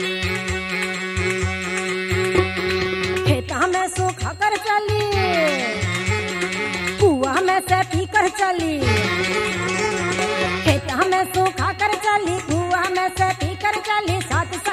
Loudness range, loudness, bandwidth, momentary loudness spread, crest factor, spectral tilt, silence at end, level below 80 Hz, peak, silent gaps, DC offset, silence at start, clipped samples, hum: 2 LU; -20 LUFS; 15.5 kHz; 4 LU; 18 dB; -4.5 dB/octave; 0 s; -42 dBFS; -2 dBFS; none; under 0.1%; 0 s; under 0.1%; none